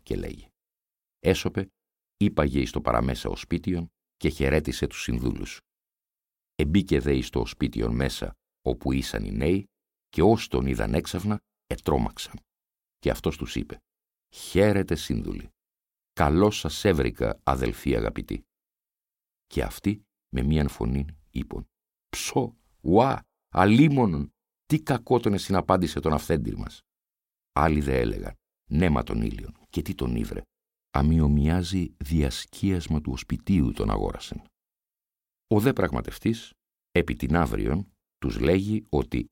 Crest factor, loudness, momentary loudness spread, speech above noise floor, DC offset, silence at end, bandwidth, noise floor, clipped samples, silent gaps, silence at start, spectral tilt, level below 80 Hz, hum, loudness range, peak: 22 dB; -26 LUFS; 14 LU; over 65 dB; under 0.1%; 0.05 s; 17 kHz; under -90 dBFS; under 0.1%; none; 0.1 s; -6.5 dB/octave; -36 dBFS; none; 6 LU; -4 dBFS